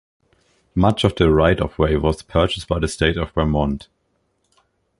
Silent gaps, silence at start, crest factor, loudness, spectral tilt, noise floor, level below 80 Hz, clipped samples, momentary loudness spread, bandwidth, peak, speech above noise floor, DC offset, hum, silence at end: none; 0.75 s; 20 dB; -19 LUFS; -6.5 dB/octave; -68 dBFS; -30 dBFS; under 0.1%; 7 LU; 11.5 kHz; 0 dBFS; 50 dB; under 0.1%; none; 1.15 s